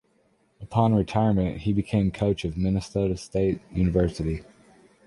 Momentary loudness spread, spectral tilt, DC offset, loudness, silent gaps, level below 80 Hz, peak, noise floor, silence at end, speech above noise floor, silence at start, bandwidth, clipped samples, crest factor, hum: 5 LU; -8 dB/octave; under 0.1%; -25 LUFS; none; -40 dBFS; -6 dBFS; -65 dBFS; 0.65 s; 41 dB; 0.6 s; 11.5 kHz; under 0.1%; 18 dB; none